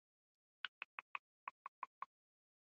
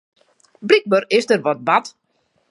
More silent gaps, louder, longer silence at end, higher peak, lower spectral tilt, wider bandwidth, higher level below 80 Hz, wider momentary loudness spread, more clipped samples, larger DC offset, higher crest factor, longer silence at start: first, 0.68-2.02 s vs none; second, -53 LUFS vs -17 LUFS; about the same, 0.7 s vs 0.6 s; second, -26 dBFS vs 0 dBFS; second, 5 dB/octave vs -4.5 dB/octave; second, 7.2 kHz vs 11.5 kHz; second, under -90 dBFS vs -68 dBFS; second, 6 LU vs 11 LU; neither; neither; first, 30 dB vs 20 dB; about the same, 0.65 s vs 0.6 s